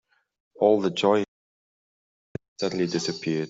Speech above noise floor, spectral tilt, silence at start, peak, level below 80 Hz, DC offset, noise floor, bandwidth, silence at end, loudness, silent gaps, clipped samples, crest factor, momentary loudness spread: over 67 dB; -5 dB/octave; 0.6 s; -6 dBFS; -66 dBFS; under 0.1%; under -90 dBFS; 8 kHz; 0 s; -24 LUFS; 1.28-2.35 s, 2.48-2.56 s; under 0.1%; 20 dB; 19 LU